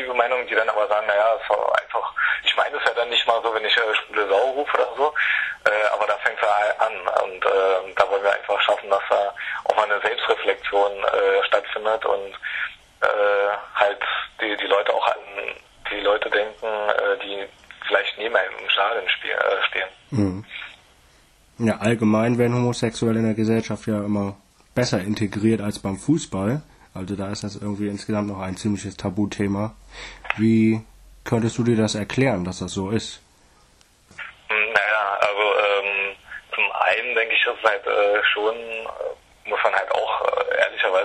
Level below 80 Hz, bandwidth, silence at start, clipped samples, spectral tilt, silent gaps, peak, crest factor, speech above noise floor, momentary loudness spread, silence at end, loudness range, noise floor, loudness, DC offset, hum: -54 dBFS; 12.5 kHz; 0 s; under 0.1%; -5 dB/octave; none; -2 dBFS; 20 dB; 34 dB; 10 LU; 0 s; 4 LU; -56 dBFS; -22 LUFS; under 0.1%; none